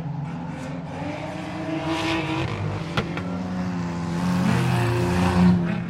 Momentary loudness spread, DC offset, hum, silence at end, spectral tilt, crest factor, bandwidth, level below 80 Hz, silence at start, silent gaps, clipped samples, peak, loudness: 12 LU; under 0.1%; none; 0 s; -6.5 dB/octave; 18 dB; 13 kHz; -48 dBFS; 0 s; none; under 0.1%; -6 dBFS; -25 LUFS